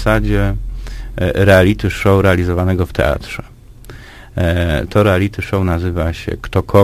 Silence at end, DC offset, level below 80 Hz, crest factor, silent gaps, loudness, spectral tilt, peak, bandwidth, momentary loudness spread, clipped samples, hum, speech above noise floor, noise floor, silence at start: 0 s; under 0.1%; -24 dBFS; 14 dB; none; -15 LUFS; -7 dB/octave; 0 dBFS; 15.5 kHz; 17 LU; under 0.1%; none; 22 dB; -35 dBFS; 0 s